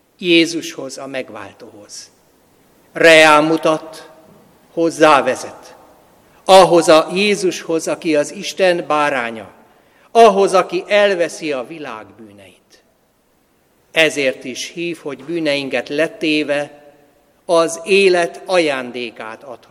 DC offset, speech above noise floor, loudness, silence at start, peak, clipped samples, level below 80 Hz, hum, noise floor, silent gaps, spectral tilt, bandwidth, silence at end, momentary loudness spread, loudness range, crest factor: under 0.1%; 43 dB; -14 LUFS; 0.2 s; 0 dBFS; 0.1%; -60 dBFS; none; -58 dBFS; none; -3.5 dB/octave; 15.5 kHz; 0.15 s; 21 LU; 8 LU; 16 dB